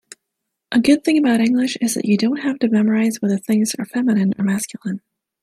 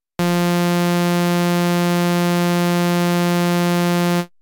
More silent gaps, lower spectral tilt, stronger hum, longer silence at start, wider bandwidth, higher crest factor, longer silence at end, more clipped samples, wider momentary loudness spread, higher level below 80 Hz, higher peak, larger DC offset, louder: neither; about the same, -5 dB/octave vs -6 dB/octave; neither; first, 0.7 s vs 0.2 s; second, 14.5 kHz vs 17.5 kHz; first, 16 dB vs 8 dB; first, 0.45 s vs 0.15 s; neither; first, 7 LU vs 0 LU; about the same, -62 dBFS vs -64 dBFS; first, -2 dBFS vs -10 dBFS; neither; about the same, -18 LUFS vs -18 LUFS